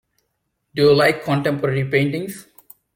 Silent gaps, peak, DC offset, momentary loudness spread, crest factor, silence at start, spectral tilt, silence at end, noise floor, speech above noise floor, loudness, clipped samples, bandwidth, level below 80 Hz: none; -4 dBFS; under 0.1%; 17 LU; 16 dB; 0.75 s; -6 dB/octave; 0.55 s; -73 dBFS; 55 dB; -18 LUFS; under 0.1%; 17 kHz; -54 dBFS